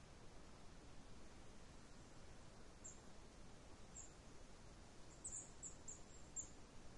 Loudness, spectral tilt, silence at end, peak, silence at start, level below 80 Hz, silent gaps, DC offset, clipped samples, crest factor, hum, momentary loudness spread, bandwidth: -58 LUFS; -3 dB/octave; 0 s; -38 dBFS; 0 s; -66 dBFS; none; under 0.1%; under 0.1%; 20 dB; none; 11 LU; 11 kHz